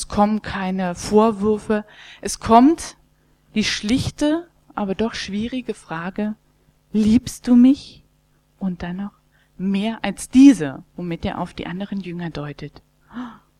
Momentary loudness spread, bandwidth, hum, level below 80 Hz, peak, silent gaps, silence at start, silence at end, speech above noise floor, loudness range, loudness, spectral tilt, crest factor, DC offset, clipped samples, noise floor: 19 LU; 13 kHz; none; -44 dBFS; 0 dBFS; none; 0 s; 0.25 s; 41 dB; 5 LU; -20 LUFS; -5.5 dB/octave; 20 dB; under 0.1%; under 0.1%; -60 dBFS